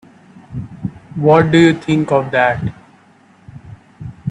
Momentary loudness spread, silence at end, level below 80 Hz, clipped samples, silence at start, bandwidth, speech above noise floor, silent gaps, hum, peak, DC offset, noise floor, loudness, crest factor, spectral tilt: 20 LU; 0 s; -48 dBFS; under 0.1%; 0.5 s; 9.6 kHz; 36 dB; none; none; 0 dBFS; under 0.1%; -48 dBFS; -14 LUFS; 16 dB; -7 dB/octave